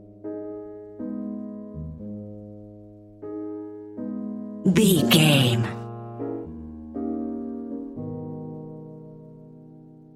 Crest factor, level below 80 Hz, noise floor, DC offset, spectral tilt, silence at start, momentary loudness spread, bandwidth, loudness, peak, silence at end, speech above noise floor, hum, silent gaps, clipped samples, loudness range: 22 dB; -54 dBFS; -47 dBFS; under 0.1%; -5 dB/octave; 0 s; 25 LU; 16 kHz; -26 LUFS; -4 dBFS; 0 s; 29 dB; none; none; under 0.1%; 14 LU